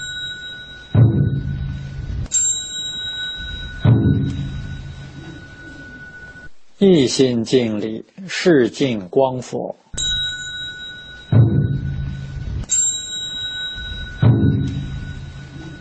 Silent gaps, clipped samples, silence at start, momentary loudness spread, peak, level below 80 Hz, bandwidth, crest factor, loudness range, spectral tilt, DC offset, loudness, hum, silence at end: none; under 0.1%; 0 s; 20 LU; -2 dBFS; -36 dBFS; 8.8 kHz; 16 dB; 4 LU; -4.5 dB/octave; under 0.1%; -19 LUFS; none; 0 s